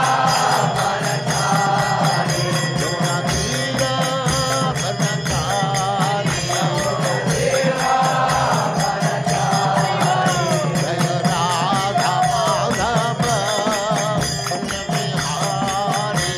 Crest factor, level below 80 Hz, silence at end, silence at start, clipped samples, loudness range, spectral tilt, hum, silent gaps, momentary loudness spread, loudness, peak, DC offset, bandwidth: 14 dB; -44 dBFS; 0 s; 0 s; under 0.1%; 1 LU; -4 dB/octave; none; none; 3 LU; -19 LUFS; -4 dBFS; under 0.1%; 15.5 kHz